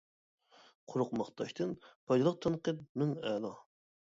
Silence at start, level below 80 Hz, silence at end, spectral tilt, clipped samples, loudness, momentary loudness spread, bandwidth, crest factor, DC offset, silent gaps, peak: 0.9 s; -74 dBFS; 0.55 s; -7 dB/octave; under 0.1%; -36 LUFS; 10 LU; 7.8 kHz; 18 dB; under 0.1%; 1.95-2.07 s, 2.89-2.95 s; -18 dBFS